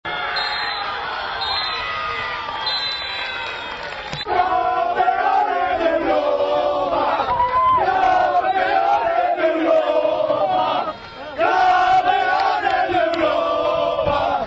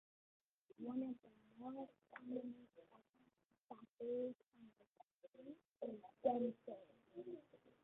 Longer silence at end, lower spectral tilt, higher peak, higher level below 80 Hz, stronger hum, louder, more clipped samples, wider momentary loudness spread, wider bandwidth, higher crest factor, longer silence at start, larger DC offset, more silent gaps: second, 0 s vs 0.15 s; second, -4.5 dB/octave vs -6.5 dB/octave; first, -6 dBFS vs -26 dBFS; first, -48 dBFS vs under -90 dBFS; neither; first, -19 LUFS vs -49 LUFS; neither; second, 8 LU vs 23 LU; first, 8 kHz vs 4 kHz; second, 14 dB vs 24 dB; second, 0.05 s vs 0.8 s; neither; second, none vs 3.45-3.49 s, 3.61-3.69 s, 3.89-3.97 s, 4.87-4.93 s, 5.04-5.20 s, 5.28-5.32 s, 5.65-5.72 s